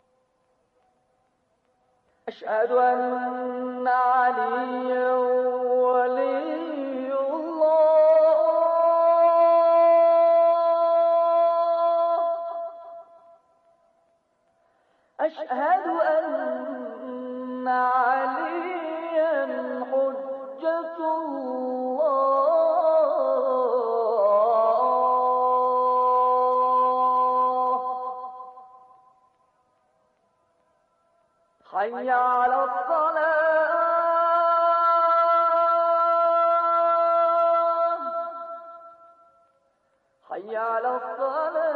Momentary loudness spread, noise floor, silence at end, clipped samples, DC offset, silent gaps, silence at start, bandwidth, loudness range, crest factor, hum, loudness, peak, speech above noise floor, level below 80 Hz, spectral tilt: 12 LU; -69 dBFS; 0 s; under 0.1%; under 0.1%; none; 2.25 s; 4.7 kHz; 11 LU; 12 dB; none; -22 LUFS; -10 dBFS; 46 dB; -80 dBFS; -6 dB/octave